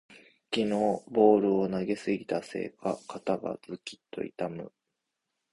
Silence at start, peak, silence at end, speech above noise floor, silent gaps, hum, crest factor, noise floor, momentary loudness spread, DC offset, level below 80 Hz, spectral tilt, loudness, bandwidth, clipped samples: 0.1 s; -10 dBFS; 0.85 s; 55 dB; none; none; 20 dB; -84 dBFS; 18 LU; under 0.1%; -68 dBFS; -6.5 dB/octave; -29 LUFS; 11.5 kHz; under 0.1%